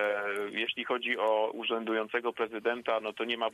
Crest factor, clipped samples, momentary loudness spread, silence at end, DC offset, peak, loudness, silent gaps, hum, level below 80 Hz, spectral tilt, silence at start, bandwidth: 16 dB; under 0.1%; 4 LU; 0 s; under 0.1%; -16 dBFS; -32 LUFS; none; none; -80 dBFS; -4 dB/octave; 0 s; 13.5 kHz